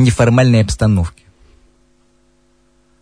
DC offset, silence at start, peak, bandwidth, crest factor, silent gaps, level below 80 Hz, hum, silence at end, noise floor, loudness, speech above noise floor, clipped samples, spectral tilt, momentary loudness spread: under 0.1%; 0 s; 0 dBFS; 10.5 kHz; 16 dB; none; -32 dBFS; none; 1.95 s; -56 dBFS; -13 LUFS; 44 dB; under 0.1%; -6.5 dB/octave; 7 LU